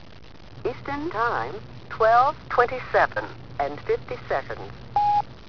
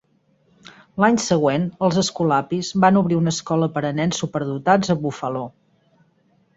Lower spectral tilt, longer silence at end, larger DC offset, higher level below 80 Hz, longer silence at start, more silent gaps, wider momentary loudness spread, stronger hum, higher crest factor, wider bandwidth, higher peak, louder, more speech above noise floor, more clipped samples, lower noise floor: about the same, -6 dB/octave vs -5.5 dB/octave; second, 0.05 s vs 1.1 s; first, 0.8% vs under 0.1%; first, -50 dBFS vs -56 dBFS; second, 0.05 s vs 0.95 s; neither; first, 15 LU vs 9 LU; neither; about the same, 20 dB vs 20 dB; second, 5.4 kHz vs 8 kHz; second, -6 dBFS vs -2 dBFS; second, -24 LUFS vs -20 LUFS; second, 21 dB vs 42 dB; neither; second, -46 dBFS vs -61 dBFS